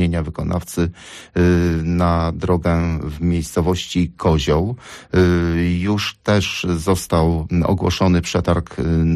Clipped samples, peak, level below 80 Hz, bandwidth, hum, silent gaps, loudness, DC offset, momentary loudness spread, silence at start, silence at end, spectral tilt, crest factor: under 0.1%; -6 dBFS; -32 dBFS; 13.5 kHz; none; none; -19 LUFS; under 0.1%; 7 LU; 0 s; 0 s; -6.5 dB/octave; 12 dB